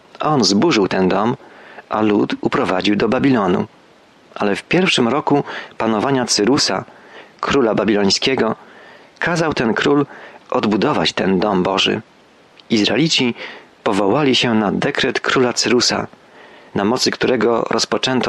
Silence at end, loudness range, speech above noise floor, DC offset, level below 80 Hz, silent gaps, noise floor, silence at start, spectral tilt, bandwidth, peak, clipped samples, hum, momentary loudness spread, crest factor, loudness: 0 s; 1 LU; 32 dB; under 0.1%; -52 dBFS; none; -48 dBFS; 0.2 s; -4 dB/octave; 12.5 kHz; -4 dBFS; under 0.1%; none; 9 LU; 14 dB; -16 LUFS